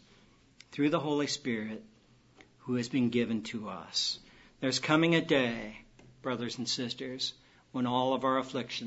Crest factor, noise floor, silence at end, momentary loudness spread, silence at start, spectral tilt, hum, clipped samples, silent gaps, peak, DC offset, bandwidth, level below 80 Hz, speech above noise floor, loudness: 22 dB; -62 dBFS; 0 s; 15 LU; 0.7 s; -4.5 dB/octave; none; under 0.1%; none; -10 dBFS; under 0.1%; 8 kHz; -68 dBFS; 30 dB; -32 LUFS